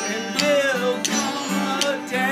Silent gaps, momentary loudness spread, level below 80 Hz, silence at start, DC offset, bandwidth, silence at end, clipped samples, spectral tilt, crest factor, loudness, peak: none; 5 LU; -70 dBFS; 0 s; under 0.1%; 15.5 kHz; 0 s; under 0.1%; -2.5 dB/octave; 20 dB; -21 LUFS; -2 dBFS